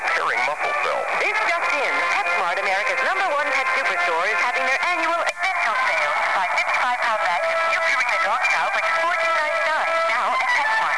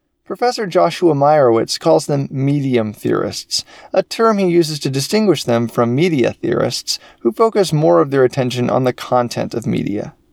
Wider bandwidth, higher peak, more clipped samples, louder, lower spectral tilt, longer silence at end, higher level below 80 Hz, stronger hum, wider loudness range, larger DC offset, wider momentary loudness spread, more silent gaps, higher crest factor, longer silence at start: second, 11 kHz vs 17.5 kHz; second, -8 dBFS vs 0 dBFS; neither; second, -20 LUFS vs -16 LUFS; second, -0.5 dB/octave vs -5.5 dB/octave; second, 0 s vs 0.2 s; second, -68 dBFS vs -54 dBFS; neither; about the same, 1 LU vs 1 LU; first, 0.6% vs under 0.1%; second, 2 LU vs 8 LU; neither; about the same, 12 dB vs 16 dB; second, 0 s vs 0.3 s